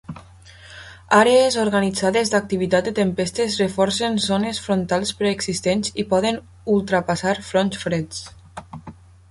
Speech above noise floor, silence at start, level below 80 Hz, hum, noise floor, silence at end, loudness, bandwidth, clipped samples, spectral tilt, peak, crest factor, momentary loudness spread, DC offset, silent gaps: 25 dB; 0.1 s; -50 dBFS; none; -45 dBFS; 0.4 s; -20 LUFS; 11.5 kHz; under 0.1%; -4.5 dB/octave; -2 dBFS; 18 dB; 22 LU; under 0.1%; none